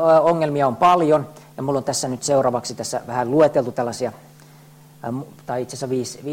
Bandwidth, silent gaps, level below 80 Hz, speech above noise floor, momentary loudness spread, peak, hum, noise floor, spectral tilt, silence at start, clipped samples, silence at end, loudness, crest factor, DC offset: 16.5 kHz; none; -60 dBFS; 27 dB; 14 LU; -6 dBFS; none; -46 dBFS; -5 dB/octave; 0 s; under 0.1%; 0 s; -20 LUFS; 16 dB; under 0.1%